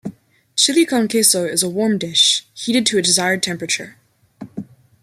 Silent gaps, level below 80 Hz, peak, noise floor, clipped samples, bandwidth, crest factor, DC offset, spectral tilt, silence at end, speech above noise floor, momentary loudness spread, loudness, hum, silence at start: none; -64 dBFS; 0 dBFS; -39 dBFS; under 0.1%; 16 kHz; 18 dB; under 0.1%; -2 dB/octave; 0.4 s; 22 dB; 20 LU; -16 LUFS; none; 0.05 s